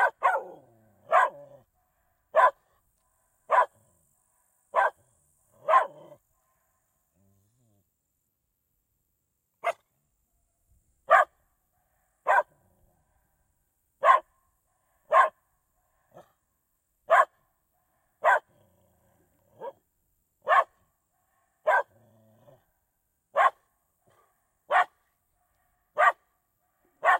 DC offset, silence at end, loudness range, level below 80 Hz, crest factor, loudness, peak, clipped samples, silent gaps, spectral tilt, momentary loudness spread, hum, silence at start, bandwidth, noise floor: under 0.1%; 0 s; 5 LU; -78 dBFS; 22 dB; -25 LUFS; -8 dBFS; under 0.1%; none; -1.5 dB/octave; 17 LU; none; 0 s; 15.5 kHz; -78 dBFS